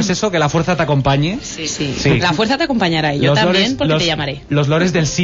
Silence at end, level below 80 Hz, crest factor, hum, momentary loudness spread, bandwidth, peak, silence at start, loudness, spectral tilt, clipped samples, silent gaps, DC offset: 0 s; -38 dBFS; 12 dB; none; 6 LU; 7.8 kHz; -2 dBFS; 0 s; -15 LUFS; -5 dB/octave; under 0.1%; none; under 0.1%